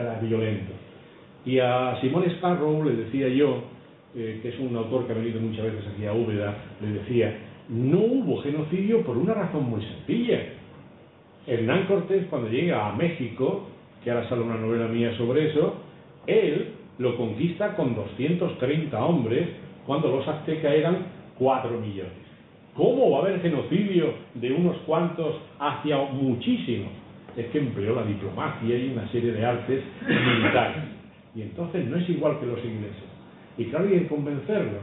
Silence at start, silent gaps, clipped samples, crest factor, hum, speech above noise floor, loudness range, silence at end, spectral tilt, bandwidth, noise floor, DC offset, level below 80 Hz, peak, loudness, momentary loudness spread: 0 s; none; under 0.1%; 18 dB; none; 26 dB; 3 LU; 0 s; -11.5 dB/octave; 4.1 kHz; -51 dBFS; under 0.1%; -62 dBFS; -8 dBFS; -26 LUFS; 13 LU